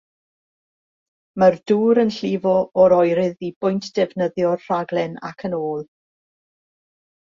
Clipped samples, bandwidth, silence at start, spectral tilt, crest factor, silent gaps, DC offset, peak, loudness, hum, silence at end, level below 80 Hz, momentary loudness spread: under 0.1%; 7.4 kHz; 1.35 s; -7 dB/octave; 18 dB; 3.56-3.61 s; under 0.1%; -2 dBFS; -19 LUFS; none; 1.45 s; -62 dBFS; 12 LU